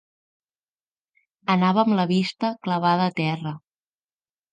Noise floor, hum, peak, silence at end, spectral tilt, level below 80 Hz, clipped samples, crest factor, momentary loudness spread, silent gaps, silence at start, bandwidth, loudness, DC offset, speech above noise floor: under -90 dBFS; none; -6 dBFS; 0.95 s; -7 dB/octave; -72 dBFS; under 0.1%; 18 dB; 12 LU; none; 1.5 s; 9 kHz; -22 LUFS; under 0.1%; over 68 dB